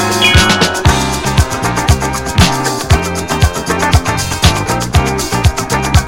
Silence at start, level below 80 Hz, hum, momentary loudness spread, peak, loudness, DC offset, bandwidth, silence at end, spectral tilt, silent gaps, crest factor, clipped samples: 0 s; -20 dBFS; none; 6 LU; 0 dBFS; -12 LUFS; under 0.1%; 17 kHz; 0 s; -4 dB/octave; none; 12 dB; 0.3%